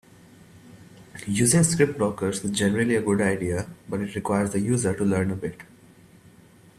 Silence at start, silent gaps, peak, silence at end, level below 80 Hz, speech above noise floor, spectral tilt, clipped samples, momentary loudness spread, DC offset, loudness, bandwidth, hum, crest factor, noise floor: 0.55 s; none; -6 dBFS; 1.15 s; -56 dBFS; 29 dB; -5 dB/octave; under 0.1%; 12 LU; under 0.1%; -24 LUFS; 14.5 kHz; none; 20 dB; -52 dBFS